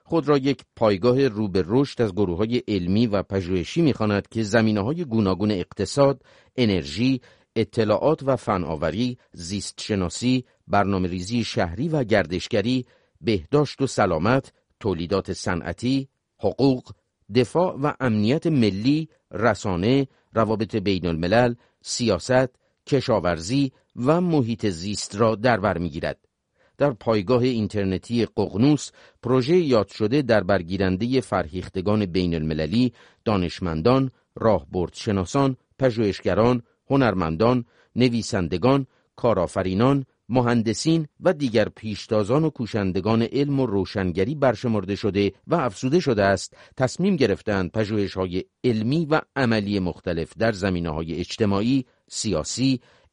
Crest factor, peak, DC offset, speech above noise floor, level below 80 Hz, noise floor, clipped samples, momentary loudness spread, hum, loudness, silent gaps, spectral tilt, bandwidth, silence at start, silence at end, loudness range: 18 dB; -4 dBFS; under 0.1%; 43 dB; -48 dBFS; -66 dBFS; under 0.1%; 7 LU; none; -23 LUFS; none; -6 dB/octave; 10.5 kHz; 0.1 s; 0.35 s; 2 LU